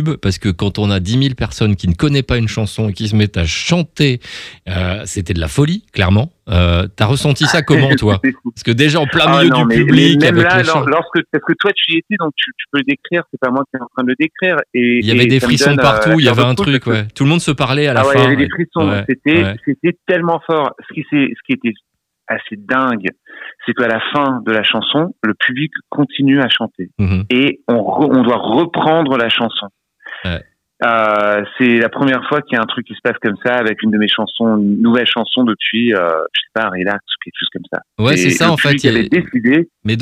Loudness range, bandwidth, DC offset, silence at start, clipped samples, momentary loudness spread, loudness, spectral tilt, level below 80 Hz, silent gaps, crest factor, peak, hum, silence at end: 5 LU; 15 kHz; under 0.1%; 0 s; under 0.1%; 10 LU; -14 LUFS; -5.5 dB/octave; -38 dBFS; none; 14 dB; 0 dBFS; none; 0 s